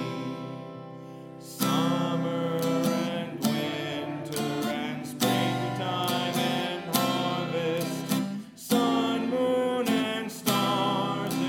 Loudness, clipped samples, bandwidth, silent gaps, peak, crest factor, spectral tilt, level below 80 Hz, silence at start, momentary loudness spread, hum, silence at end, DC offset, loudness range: -28 LUFS; under 0.1%; 17.5 kHz; none; -6 dBFS; 22 dB; -4.5 dB/octave; -72 dBFS; 0 s; 10 LU; none; 0 s; under 0.1%; 2 LU